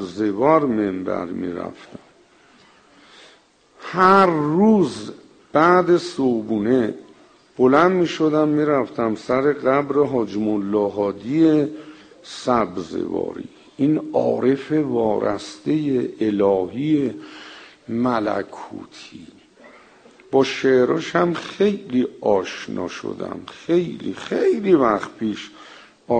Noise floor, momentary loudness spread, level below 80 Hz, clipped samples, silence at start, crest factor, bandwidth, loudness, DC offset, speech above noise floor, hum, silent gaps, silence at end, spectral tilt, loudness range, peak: -54 dBFS; 17 LU; -58 dBFS; under 0.1%; 0 s; 20 dB; 9.4 kHz; -20 LUFS; under 0.1%; 34 dB; none; none; 0 s; -6.5 dB/octave; 5 LU; 0 dBFS